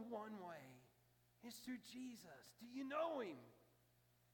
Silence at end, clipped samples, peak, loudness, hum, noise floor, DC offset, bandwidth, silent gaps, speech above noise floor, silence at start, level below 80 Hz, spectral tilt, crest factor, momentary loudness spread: 0.6 s; under 0.1%; -34 dBFS; -51 LUFS; 60 Hz at -80 dBFS; -77 dBFS; under 0.1%; 18 kHz; none; 26 dB; 0 s; -90 dBFS; -4.5 dB/octave; 20 dB; 17 LU